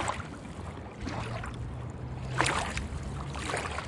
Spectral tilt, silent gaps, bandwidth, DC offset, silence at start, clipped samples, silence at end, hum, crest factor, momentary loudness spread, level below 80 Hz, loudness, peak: -4 dB/octave; none; 11.5 kHz; under 0.1%; 0 s; under 0.1%; 0 s; none; 28 dB; 13 LU; -44 dBFS; -35 LUFS; -6 dBFS